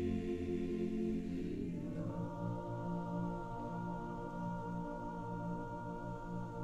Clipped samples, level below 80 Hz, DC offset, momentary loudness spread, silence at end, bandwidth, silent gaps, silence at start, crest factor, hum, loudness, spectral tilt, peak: under 0.1%; -54 dBFS; under 0.1%; 6 LU; 0 s; 8.4 kHz; none; 0 s; 12 dB; none; -42 LUFS; -9 dB/octave; -28 dBFS